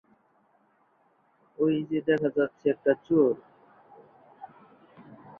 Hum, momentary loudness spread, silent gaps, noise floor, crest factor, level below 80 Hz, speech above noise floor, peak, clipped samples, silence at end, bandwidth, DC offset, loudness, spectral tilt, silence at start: none; 25 LU; none; -67 dBFS; 20 dB; -72 dBFS; 41 dB; -10 dBFS; under 0.1%; 0.25 s; 3.7 kHz; under 0.1%; -26 LUFS; -9 dB/octave; 1.6 s